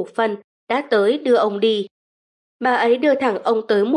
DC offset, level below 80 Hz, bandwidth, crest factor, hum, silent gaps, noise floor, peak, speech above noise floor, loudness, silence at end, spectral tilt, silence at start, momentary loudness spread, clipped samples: under 0.1%; -78 dBFS; 11 kHz; 14 dB; none; 0.44-0.67 s, 1.91-2.60 s; under -90 dBFS; -6 dBFS; over 72 dB; -19 LUFS; 0 s; -5.5 dB/octave; 0 s; 8 LU; under 0.1%